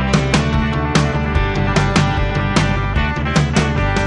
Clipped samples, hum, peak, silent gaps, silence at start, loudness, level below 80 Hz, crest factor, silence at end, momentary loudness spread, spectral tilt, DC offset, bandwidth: under 0.1%; none; 0 dBFS; none; 0 s; -16 LUFS; -22 dBFS; 14 dB; 0 s; 3 LU; -5.5 dB/octave; under 0.1%; 11.5 kHz